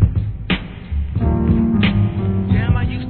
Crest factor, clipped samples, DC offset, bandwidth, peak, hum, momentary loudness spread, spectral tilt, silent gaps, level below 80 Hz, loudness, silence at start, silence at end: 16 dB; under 0.1%; 0.2%; 4.5 kHz; 0 dBFS; none; 8 LU; -11 dB/octave; none; -24 dBFS; -18 LUFS; 0 s; 0 s